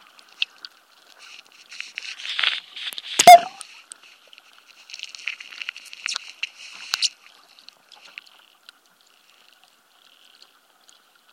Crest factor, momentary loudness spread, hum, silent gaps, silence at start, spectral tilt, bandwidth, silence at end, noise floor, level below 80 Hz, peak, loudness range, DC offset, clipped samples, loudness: 24 dB; 30 LU; none; none; 2.05 s; 0 dB/octave; 16.5 kHz; 4.25 s; -58 dBFS; -74 dBFS; 0 dBFS; 13 LU; under 0.1%; under 0.1%; -20 LUFS